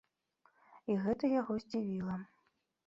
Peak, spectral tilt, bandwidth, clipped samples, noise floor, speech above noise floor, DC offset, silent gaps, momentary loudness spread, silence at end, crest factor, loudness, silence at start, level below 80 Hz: -22 dBFS; -7.5 dB/octave; 7.6 kHz; under 0.1%; -78 dBFS; 43 dB; under 0.1%; none; 12 LU; 0.6 s; 16 dB; -37 LUFS; 0.7 s; -70 dBFS